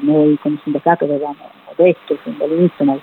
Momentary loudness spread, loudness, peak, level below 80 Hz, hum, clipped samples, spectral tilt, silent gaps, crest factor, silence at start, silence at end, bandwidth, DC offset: 11 LU; -16 LUFS; -2 dBFS; -68 dBFS; none; under 0.1%; -10.5 dB/octave; none; 14 dB; 0 s; 0 s; 4.2 kHz; under 0.1%